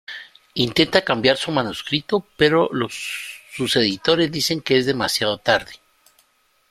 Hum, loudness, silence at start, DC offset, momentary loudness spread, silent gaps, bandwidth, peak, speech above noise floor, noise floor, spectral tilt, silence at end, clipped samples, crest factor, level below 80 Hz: none; -20 LUFS; 0.1 s; under 0.1%; 12 LU; none; 15.5 kHz; 0 dBFS; 42 dB; -62 dBFS; -4 dB/octave; 0.95 s; under 0.1%; 22 dB; -54 dBFS